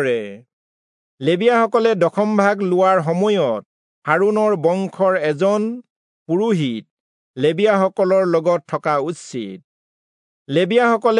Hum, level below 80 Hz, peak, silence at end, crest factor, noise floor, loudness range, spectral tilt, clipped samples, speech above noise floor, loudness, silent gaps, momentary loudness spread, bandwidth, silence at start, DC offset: none; -76 dBFS; -2 dBFS; 0 s; 16 dB; under -90 dBFS; 3 LU; -6.5 dB/octave; under 0.1%; over 73 dB; -18 LUFS; 0.53-1.18 s, 3.66-4.02 s, 5.90-6.26 s, 6.91-7.34 s, 9.64-10.45 s; 12 LU; 10.5 kHz; 0 s; under 0.1%